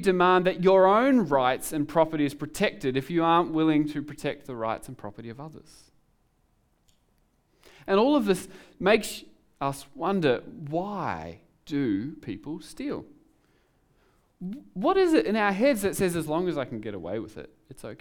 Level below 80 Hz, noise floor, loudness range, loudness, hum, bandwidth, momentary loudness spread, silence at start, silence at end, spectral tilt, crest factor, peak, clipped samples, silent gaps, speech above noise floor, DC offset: -58 dBFS; -68 dBFS; 11 LU; -26 LUFS; none; 19.5 kHz; 19 LU; 0 s; 0.05 s; -5.5 dB/octave; 20 dB; -8 dBFS; under 0.1%; none; 42 dB; under 0.1%